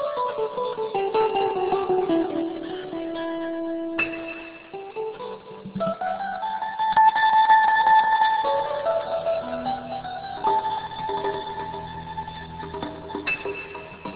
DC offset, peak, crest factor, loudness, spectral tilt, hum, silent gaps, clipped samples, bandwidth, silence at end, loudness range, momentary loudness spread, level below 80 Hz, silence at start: under 0.1%; -6 dBFS; 18 dB; -24 LUFS; -8.5 dB/octave; none; none; under 0.1%; 4 kHz; 0 s; 10 LU; 17 LU; -56 dBFS; 0 s